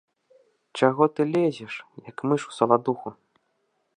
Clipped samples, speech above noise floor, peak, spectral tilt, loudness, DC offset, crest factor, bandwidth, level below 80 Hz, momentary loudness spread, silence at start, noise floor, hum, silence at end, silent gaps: under 0.1%; 49 dB; -4 dBFS; -6.5 dB/octave; -24 LUFS; under 0.1%; 22 dB; 10 kHz; -76 dBFS; 17 LU; 0.75 s; -73 dBFS; none; 0.85 s; none